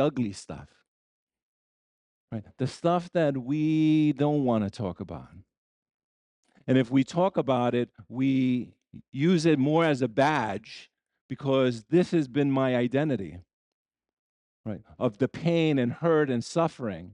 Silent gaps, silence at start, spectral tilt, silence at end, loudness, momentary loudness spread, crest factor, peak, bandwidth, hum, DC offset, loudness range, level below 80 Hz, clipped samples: 0.88-1.27 s, 1.42-2.28 s, 5.57-5.86 s, 5.94-6.43 s, 9.08-9.12 s, 11.21-11.29 s, 13.53-13.85 s, 14.13-14.64 s; 0 s; -7 dB/octave; 0 s; -26 LUFS; 17 LU; 18 dB; -10 dBFS; 10.5 kHz; none; under 0.1%; 4 LU; -66 dBFS; under 0.1%